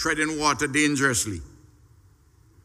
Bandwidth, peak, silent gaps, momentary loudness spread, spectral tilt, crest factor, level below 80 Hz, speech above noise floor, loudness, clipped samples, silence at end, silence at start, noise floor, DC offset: 15.5 kHz; -8 dBFS; none; 8 LU; -3 dB/octave; 20 dB; -50 dBFS; 33 dB; -23 LUFS; under 0.1%; 1.15 s; 0 s; -57 dBFS; under 0.1%